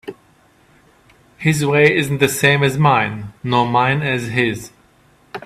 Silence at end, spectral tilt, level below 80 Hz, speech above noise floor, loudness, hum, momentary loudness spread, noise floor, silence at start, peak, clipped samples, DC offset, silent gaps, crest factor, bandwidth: 0.05 s; -5 dB/octave; -52 dBFS; 37 dB; -16 LUFS; none; 12 LU; -53 dBFS; 0.05 s; 0 dBFS; under 0.1%; under 0.1%; none; 18 dB; 15.5 kHz